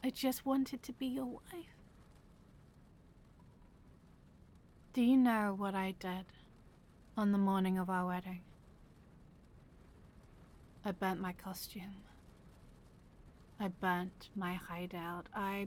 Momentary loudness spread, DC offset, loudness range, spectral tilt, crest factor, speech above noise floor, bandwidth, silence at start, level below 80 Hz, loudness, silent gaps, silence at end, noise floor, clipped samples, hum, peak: 17 LU; under 0.1%; 11 LU; -6 dB/octave; 18 dB; 25 dB; 17.5 kHz; 0 s; -64 dBFS; -38 LUFS; none; 0 s; -62 dBFS; under 0.1%; none; -22 dBFS